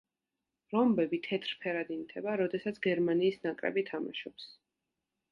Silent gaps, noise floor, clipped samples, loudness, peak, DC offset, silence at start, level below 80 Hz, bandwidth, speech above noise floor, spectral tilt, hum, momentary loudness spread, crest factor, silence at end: none; -89 dBFS; under 0.1%; -33 LUFS; -16 dBFS; under 0.1%; 0.7 s; -74 dBFS; 7.2 kHz; 56 dB; -7.5 dB/octave; none; 11 LU; 18 dB; 0.8 s